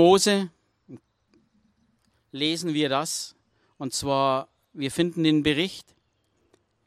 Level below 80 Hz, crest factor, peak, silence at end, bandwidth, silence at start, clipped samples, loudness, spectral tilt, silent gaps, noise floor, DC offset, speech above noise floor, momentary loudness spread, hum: -60 dBFS; 20 dB; -6 dBFS; 1.05 s; 15 kHz; 0 s; under 0.1%; -25 LUFS; -4 dB/octave; none; -70 dBFS; under 0.1%; 46 dB; 16 LU; none